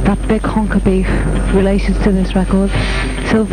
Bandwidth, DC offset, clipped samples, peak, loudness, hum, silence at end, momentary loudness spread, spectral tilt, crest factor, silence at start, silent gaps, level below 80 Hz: 9.4 kHz; under 0.1%; under 0.1%; 0 dBFS; -15 LUFS; none; 0 s; 3 LU; -7 dB/octave; 14 dB; 0 s; none; -18 dBFS